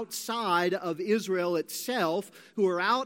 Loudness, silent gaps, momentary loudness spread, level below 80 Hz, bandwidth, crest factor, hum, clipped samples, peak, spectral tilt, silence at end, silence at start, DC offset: -29 LUFS; none; 6 LU; -86 dBFS; 17 kHz; 16 dB; none; under 0.1%; -12 dBFS; -4 dB/octave; 0 s; 0 s; under 0.1%